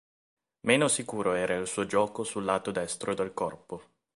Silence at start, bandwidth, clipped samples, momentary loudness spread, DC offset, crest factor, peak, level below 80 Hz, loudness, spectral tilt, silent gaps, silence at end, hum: 0.65 s; 11.5 kHz; under 0.1%; 10 LU; under 0.1%; 24 dB; -6 dBFS; -64 dBFS; -29 LUFS; -3.5 dB/octave; none; 0.35 s; none